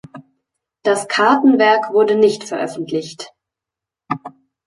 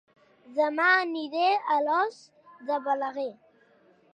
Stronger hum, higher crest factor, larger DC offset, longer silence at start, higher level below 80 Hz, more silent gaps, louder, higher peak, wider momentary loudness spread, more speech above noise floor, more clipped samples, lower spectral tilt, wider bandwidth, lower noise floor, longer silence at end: neither; about the same, 16 dB vs 18 dB; neither; second, 0.15 s vs 0.5 s; first, -68 dBFS vs -88 dBFS; neither; first, -16 LUFS vs -26 LUFS; first, 0 dBFS vs -10 dBFS; about the same, 15 LU vs 13 LU; first, 71 dB vs 35 dB; neither; first, -4.5 dB/octave vs -3 dB/octave; first, 11.5 kHz vs 9.6 kHz; first, -86 dBFS vs -61 dBFS; second, 0.4 s vs 0.8 s